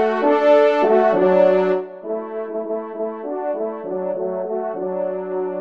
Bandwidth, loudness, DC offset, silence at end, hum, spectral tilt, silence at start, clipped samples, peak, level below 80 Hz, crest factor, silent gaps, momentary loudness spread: 6.6 kHz; -19 LUFS; 0.1%; 0 s; none; -7.5 dB/octave; 0 s; under 0.1%; -4 dBFS; -70 dBFS; 16 dB; none; 13 LU